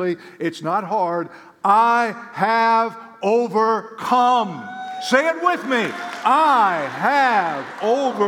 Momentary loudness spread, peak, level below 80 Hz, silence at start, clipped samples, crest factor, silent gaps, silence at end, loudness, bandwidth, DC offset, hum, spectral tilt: 11 LU; -2 dBFS; -80 dBFS; 0 s; under 0.1%; 16 dB; none; 0 s; -19 LUFS; 17.5 kHz; under 0.1%; none; -4.5 dB/octave